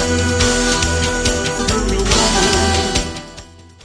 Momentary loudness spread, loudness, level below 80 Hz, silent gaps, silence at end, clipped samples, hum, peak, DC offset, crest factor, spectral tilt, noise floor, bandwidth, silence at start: 7 LU; -15 LUFS; -24 dBFS; none; 0.25 s; under 0.1%; none; 0 dBFS; under 0.1%; 16 dB; -3 dB/octave; -38 dBFS; 11 kHz; 0 s